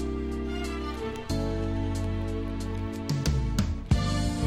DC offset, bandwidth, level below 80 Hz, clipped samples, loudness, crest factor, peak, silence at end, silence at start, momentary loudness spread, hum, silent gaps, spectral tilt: under 0.1%; 16 kHz; -34 dBFS; under 0.1%; -30 LUFS; 18 dB; -10 dBFS; 0 s; 0 s; 6 LU; none; none; -6 dB/octave